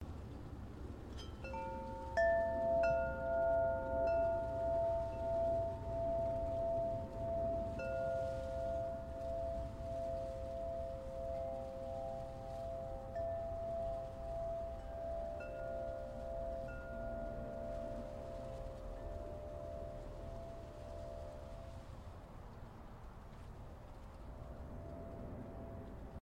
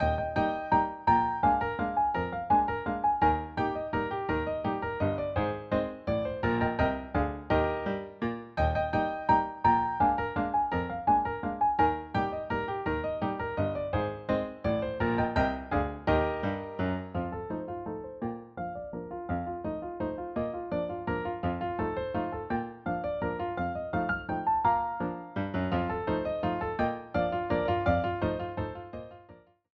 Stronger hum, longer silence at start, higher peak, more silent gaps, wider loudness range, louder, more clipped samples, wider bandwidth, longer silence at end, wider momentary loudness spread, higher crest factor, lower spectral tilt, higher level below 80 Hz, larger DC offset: neither; about the same, 0 s vs 0 s; second, -24 dBFS vs -12 dBFS; neither; first, 16 LU vs 6 LU; second, -42 LUFS vs -30 LUFS; neither; first, 10.5 kHz vs 7 kHz; second, 0 s vs 0.35 s; first, 16 LU vs 9 LU; about the same, 16 dB vs 18 dB; second, -7.5 dB/octave vs -9 dB/octave; second, -52 dBFS vs -46 dBFS; neither